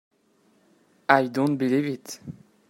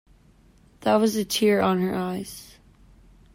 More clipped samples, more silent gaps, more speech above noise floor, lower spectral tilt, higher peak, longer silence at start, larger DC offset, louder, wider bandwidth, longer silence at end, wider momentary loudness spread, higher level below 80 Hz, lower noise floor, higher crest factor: neither; neither; first, 40 dB vs 33 dB; about the same, -6 dB/octave vs -5 dB/octave; first, 0 dBFS vs -8 dBFS; first, 1.1 s vs 0.8 s; neither; about the same, -24 LUFS vs -23 LUFS; about the same, 16 kHz vs 16 kHz; second, 0.35 s vs 0.9 s; first, 18 LU vs 14 LU; second, -70 dBFS vs -56 dBFS; first, -64 dBFS vs -56 dBFS; first, 26 dB vs 18 dB